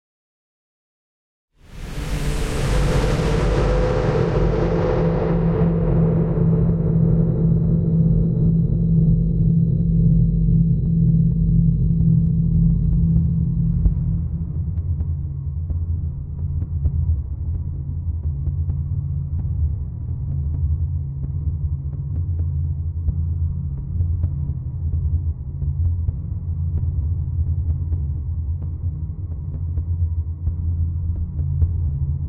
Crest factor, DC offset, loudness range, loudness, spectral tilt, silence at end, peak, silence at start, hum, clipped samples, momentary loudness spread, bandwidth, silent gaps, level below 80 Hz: 14 dB; under 0.1%; 7 LU; -21 LUFS; -9 dB/octave; 0 s; -6 dBFS; 1.7 s; none; under 0.1%; 9 LU; 10 kHz; none; -26 dBFS